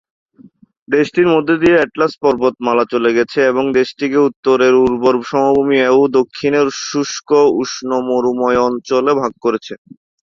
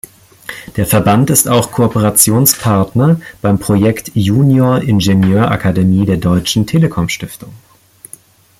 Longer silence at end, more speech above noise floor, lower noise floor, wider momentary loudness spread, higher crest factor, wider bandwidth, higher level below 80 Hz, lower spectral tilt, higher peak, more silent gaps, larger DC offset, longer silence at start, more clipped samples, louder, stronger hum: second, 0.55 s vs 1.05 s; about the same, 32 dB vs 29 dB; first, -45 dBFS vs -40 dBFS; second, 7 LU vs 10 LU; about the same, 14 dB vs 12 dB; second, 7.4 kHz vs 17 kHz; second, -52 dBFS vs -40 dBFS; about the same, -5 dB/octave vs -5 dB/octave; about the same, -2 dBFS vs 0 dBFS; first, 4.36-4.43 s vs none; neither; first, 0.9 s vs 0.5 s; neither; second, -14 LUFS vs -11 LUFS; neither